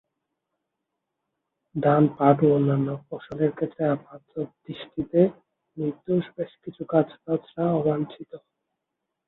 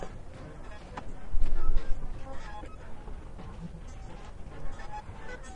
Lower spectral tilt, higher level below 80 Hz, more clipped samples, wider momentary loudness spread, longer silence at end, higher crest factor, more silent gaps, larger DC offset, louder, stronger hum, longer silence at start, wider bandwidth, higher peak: first, -11.5 dB/octave vs -6 dB/octave; second, -64 dBFS vs -34 dBFS; neither; first, 16 LU vs 11 LU; first, 0.9 s vs 0 s; first, 22 dB vs 16 dB; neither; neither; first, -25 LUFS vs -42 LUFS; neither; first, 1.75 s vs 0 s; first, 4.1 kHz vs 3.7 kHz; first, -2 dBFS vs -10 dBFS